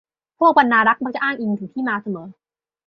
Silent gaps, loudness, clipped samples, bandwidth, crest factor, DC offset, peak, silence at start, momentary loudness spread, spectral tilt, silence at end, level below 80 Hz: none; -18 LUFS; under 0.1%; 6.4 kHz; 18 dB; under 0.1%; -2 dBFS; 0.4 s; 12 LU; -7.5 dB/octave; 0.55 s; -68 dBFS